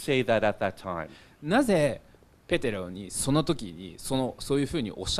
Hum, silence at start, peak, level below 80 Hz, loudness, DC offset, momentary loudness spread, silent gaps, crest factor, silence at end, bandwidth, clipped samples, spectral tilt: none; 0 s; -10 dBFS; -48 dBFS; -28 LUFS; under 0.1%; 14 LU; none; 20 dB; 0 s; 14.5 kHz; under 0.1%; -5 dB/octave